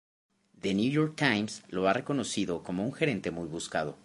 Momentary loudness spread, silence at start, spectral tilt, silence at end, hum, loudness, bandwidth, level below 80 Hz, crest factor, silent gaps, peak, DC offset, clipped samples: 8 LU; 0.65 s; -5 dB/octave; 0.1 s; none; -30 LUFS; 11.5 kHz; -62 dBFS; 24 dB; none; -8 dBFS; under 0.1%; under 0.1%